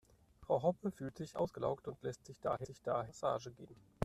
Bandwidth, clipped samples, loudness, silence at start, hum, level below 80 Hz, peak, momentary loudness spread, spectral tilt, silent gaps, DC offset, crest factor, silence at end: 13.5 kHz; under 0.1%; -40 LUFS; 0.4 s; none; -68 dBFS; -20 dBFS; 14 LU; -7 dB/octave; none; under 0.1%; 22 dB; 0 s